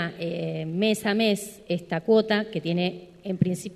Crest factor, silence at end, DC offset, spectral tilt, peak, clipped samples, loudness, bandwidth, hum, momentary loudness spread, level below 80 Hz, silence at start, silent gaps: 18 dB; 0 s; under 0.1%; -5.5 dB/octave; -8 dBFS; under 0.1%; -26 LUFS; 13.5 kHz; none; 9 LU; -64 dBFS; 0 s; none